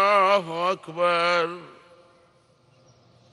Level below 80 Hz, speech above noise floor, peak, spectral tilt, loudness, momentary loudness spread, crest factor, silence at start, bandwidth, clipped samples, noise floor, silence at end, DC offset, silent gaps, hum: -76 dBFS; 35 dB; -8 dBFS; -4 dB/octave; -22 LUFS; 10 LU; 18 dB; 0 s; 11.5 kHz; under 0.1%; -60 dBFS; 1.65 s; under 0.1%; none; none